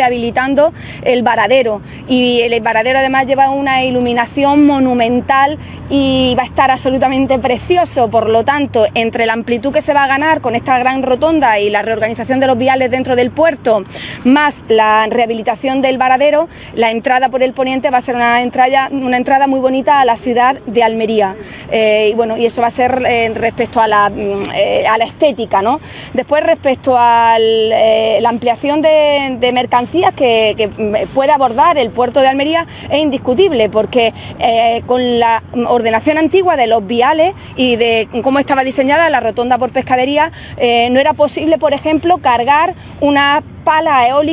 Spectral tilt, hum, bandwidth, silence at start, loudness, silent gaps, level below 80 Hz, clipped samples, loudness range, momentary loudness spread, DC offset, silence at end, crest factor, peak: -9 dB/octave; none; 4 kHz; 0 s; -12 LUFS; none; -40 dBFS; under 0.1%; 1 LU; 5 LU; under 0.1%; 0 s; 12 dB; 0 dBFS